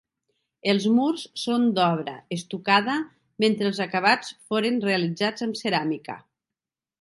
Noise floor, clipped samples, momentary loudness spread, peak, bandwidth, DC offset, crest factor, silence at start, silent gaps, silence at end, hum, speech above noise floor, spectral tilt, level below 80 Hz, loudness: -89 dBFS; under 0.1%; 11 LU; -4 dBFS; 11.5 kHz; under 0.1%; 20 dB; 0.65 s; none; 0.85 s; none; 65 dB; -5 dB/octave; -74 dBFS; -24 LUFS